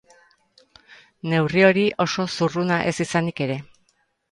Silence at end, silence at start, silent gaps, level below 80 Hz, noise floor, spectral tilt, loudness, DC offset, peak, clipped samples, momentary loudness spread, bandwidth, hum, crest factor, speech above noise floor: 0.7 s; 0.9 s; none; -60 dBFS; -67 dBFS; -5.5 dB/octave; -21 LUFS; under 0.1%; -2 dBFS; under 0.1%; 11 LU; 11.5 kHz; none; 20 dB; 46 dB